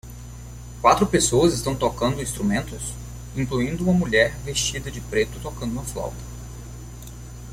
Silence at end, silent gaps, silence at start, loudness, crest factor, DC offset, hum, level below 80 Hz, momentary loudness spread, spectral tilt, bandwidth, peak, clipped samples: 0 s; none; 0.05 s; -23 LUFS; 22 dB; under 0.1%; 60 Hz at -35 dBFS; -38 dBFS; 21 LU; -4.5 dB/octave; 16.5 kHz; -2 dBFS; under 0.1%